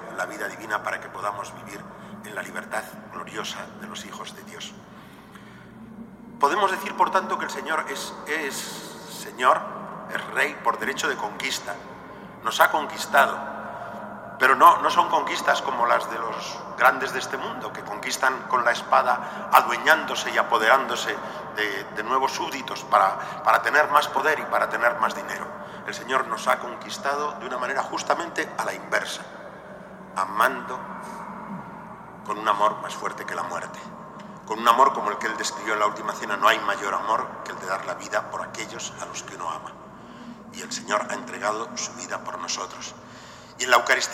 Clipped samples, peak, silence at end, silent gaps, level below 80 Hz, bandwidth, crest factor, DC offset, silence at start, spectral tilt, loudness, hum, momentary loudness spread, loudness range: under 0.1%; 0 dBFS; 0 s; none; -64 dBFS; 16 kHz; 26 dB; under 0.1%; 0 s; -2 dB/octave; -24 LUFS; none; 19 LU; 11 LU